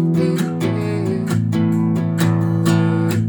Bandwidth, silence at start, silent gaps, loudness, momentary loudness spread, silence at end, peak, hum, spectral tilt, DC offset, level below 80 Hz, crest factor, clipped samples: over 20 kHz; 0 s; none; -18 LUFS; 4 LU; 0 s; -4 dBFS; none; -7.5 dB/octave; under 0.1%; -62 dBFS; 14 dB; under 0.1%